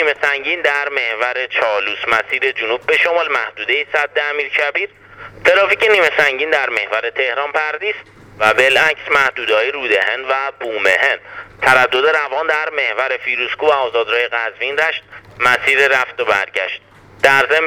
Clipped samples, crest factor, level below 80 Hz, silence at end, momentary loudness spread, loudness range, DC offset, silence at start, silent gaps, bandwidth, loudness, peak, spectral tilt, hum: under 0.1%; 16 dB; -56 dBFS; 0 s; 8 LU; 2 LU; under 0.1%; 0 s; none; 18.5 kHz; -15 LUFS; 0 dBFS; -2 dB/octave; none